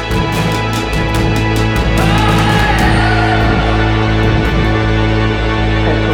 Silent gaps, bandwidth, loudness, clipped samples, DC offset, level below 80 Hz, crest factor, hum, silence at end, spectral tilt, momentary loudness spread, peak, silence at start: none; 16.5 kHz; -13 LUFS; under 0.1%; under 0.1%; -18 dBFS; 10 dB; none; 0 s; -6 dB/octave; 4 LU; 0 dBFS; 0 s